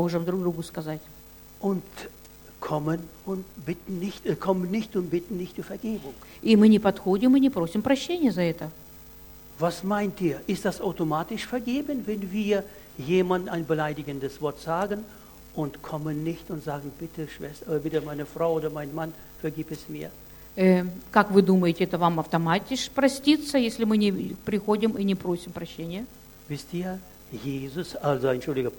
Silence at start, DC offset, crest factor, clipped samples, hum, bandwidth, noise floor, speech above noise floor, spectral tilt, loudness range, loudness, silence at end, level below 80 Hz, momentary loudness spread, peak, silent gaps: 0 s; under 0.1%; 24 dB; under 0.1%; none; 17.5 kHz; -47 dBFS; 21 dB; -6.5 dB/octave; 9 LU; -27 LUFS; 0 s; -54 dBFS; 16 LU; -2 dBFS; none